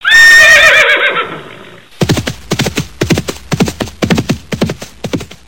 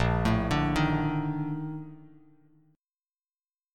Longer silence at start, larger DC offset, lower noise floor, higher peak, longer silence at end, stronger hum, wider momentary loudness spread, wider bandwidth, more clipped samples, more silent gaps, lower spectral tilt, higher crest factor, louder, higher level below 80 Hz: about the same, 0.05 s vs 0 s; neither; second, -34 dBFS vs under -90 dBFS; first, 0 dBFS vs -12 dBFS; second, 0.25 s vs 1.7 s; neither; first, 19 LU vs 13 LU; first, 17.5 kHz vs 12.5 kHz; first, 0.4% vs under 0.1%; neither; second, -3.5 dB/octave vs -7 dB/octave; second, 10 dB vs 18 dB; first, -8 LUFS vs -28 LUFS; first, -34 dBFS vs -42 dBFS